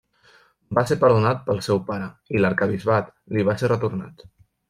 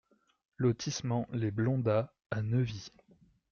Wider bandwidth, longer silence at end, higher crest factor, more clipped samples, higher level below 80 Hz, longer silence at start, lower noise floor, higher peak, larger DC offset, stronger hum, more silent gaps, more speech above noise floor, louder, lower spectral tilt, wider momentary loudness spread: first, 14.5 kHz vs 7.2 kHz; second, 0.45 s vs 0.65 s; about the same, 18 dB vs 16 dB; neither; first, -56 dBFS vs -64 dBFS; about the same, 0.7 s vs 0.6 s; second, -56 dBFS vs -65 dBFS; first, -4 dBFS vs -18 dBFS; neither; neither; second, none vs 2.26-2.30 s; about the same, 35 dB vs 34 dB; first, -22 LUFS vs -33 LUFS; about the same, -7 dB/octave vs -6.5 dB/octave; first, 11 LU vs 7 LU